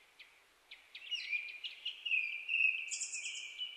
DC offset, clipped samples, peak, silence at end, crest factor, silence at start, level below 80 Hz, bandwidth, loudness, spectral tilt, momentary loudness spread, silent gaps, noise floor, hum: under 0.1%; under 0.1%; -20 dBFS; 0 s; 20 dB; 0.2 s; -88 dBFS; 13.5 kHz; -36 LUFS; 5.5 dB/octave; 20 LU; none; -64 dBFS; none